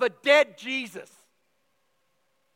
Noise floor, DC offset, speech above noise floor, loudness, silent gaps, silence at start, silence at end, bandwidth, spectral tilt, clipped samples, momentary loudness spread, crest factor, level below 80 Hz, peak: -73 dBFS; under 0.1%; 48 dB; -23 LUFS; none; 0 s; 1.55 s; 15.5 kHz; -2 dB/octave; under 0.1%; 19 LU; 22 dB; under -90 dBFS; -6 dBFS